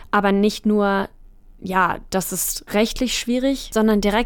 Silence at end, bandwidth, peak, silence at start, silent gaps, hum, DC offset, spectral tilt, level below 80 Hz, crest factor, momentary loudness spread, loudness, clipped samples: 0 s; 18 kHz; -6 dBFS; 0 s; none; none; under 0.1%; -4 dB/octave; -40 dBFS; 14 dB; 6 LU; -20 LUFS; under 0.1%